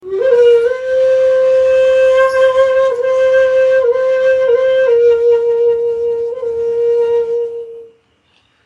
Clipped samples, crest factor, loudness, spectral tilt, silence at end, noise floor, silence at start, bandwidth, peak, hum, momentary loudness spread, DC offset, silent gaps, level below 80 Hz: under 0.1%; 10 dB; -12 LUFS; -3.5 dB/octave; 0.8 s; -56 dBFS; 0.05 s; 7.6 kHz; -2 dBFS; none; 8 LU; under 0.1%; none; -54 dBFS